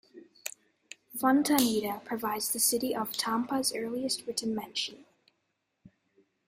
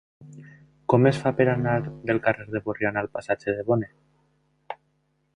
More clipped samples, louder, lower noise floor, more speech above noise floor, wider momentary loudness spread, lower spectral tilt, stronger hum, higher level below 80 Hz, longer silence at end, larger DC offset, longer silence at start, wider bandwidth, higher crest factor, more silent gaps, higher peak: neither; second, -29 LUFS vs -24 LUFS; first, -80 dBFS vs -70 dBFS; first, 50 dB vs 46 dB; second, 16 LU vs 20 LU; second, -2 dB/octave vs -8 dB/octave; neither; second, -72 dBFS vs -58 dBFS; about the same, 0.6 s vs 0.6 s; neither; about the same, 0.15 s vs 0.2 s; first, 16 kHz vs 10.5 kHz; about the same, 26 dB vs 22 dB; neither; about the same, -6 dBFS vs -4 dBFS